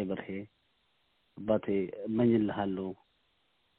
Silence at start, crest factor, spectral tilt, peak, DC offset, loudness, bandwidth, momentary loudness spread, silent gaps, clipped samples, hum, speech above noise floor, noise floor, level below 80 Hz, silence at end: 0 s; 18 dB; -7 dB/octave; -14 dBFS; under 0.1%; -32 LUFS; 4.1 kHz; 15 LU; none; under 0.1%; none; 43 dB; -74 dBFS; -66 dBFS; 0.85 s